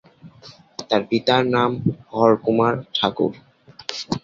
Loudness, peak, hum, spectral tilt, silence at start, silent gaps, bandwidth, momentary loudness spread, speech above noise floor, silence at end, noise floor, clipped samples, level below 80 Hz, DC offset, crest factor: -20 LUFS; -2 dBFS; none; -6 dB/octave; 0.25 s; none; 7.8 kHz; 13 LU; 27 dB; 0.05 s; -47 dBFS; under 0.1%; -56 dBFS; under 0.1%; 20 dB